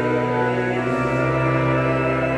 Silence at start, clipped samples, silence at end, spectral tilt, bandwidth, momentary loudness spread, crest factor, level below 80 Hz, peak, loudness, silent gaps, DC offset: 0 s; under 0.1%; 0 s; -8 dB/octave; 9.2 kHz; 2 LU; 12 dB; -42 dBFS; -8 dBFS; -20 LUFS; none; under 0.1%